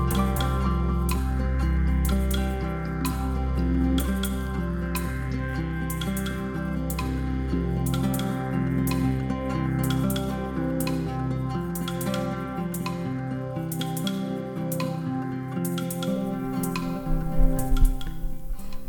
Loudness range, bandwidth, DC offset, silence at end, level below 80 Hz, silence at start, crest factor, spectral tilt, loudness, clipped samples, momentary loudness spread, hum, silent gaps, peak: 3 LU; 19 kHz; under 0.1%; 0 s; -30 dBFS; 0 s; 18 dB; -6 dB/octave; -27 LUFS; under 0.1%; 6 LU; none; none; -6 dBFS